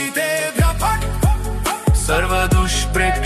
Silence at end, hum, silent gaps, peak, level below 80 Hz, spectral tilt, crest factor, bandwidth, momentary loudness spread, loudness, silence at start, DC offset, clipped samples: 0 s; none; none; -4 dBFS; -22 dBFS; -4.5 dB/octave; 14 dB; 13.5 kHz; 3 LU; -18 LUFS; 0 s; under 0.1%; under 0.1%